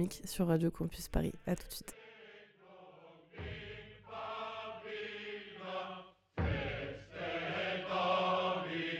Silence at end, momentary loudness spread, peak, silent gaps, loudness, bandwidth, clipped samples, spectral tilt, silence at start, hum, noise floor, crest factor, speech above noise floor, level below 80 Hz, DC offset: 0 s; 22 LU; -18 dBFS; none; -38 LUFS; 17 kHz; under 0.1%; -5.5 dB/octave; 0 s; none; -59 dBFS; 20 dB; 22 dB; -52 dBFS; under 0.1%